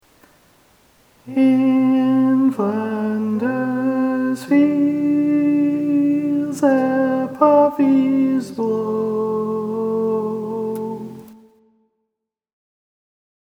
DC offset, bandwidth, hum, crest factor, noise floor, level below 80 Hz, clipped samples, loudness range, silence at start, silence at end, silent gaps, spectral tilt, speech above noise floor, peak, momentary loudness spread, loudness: under 0.1%; 11 kHz; none; 18 dB; -80 dBFS; -68 dBFS; under 0.1%; 8 LU; 1.25 s; 2.1 s; none; -7.5 dB/octave; 65 dB; 0 dBFS; 8 LU; -18 LUFS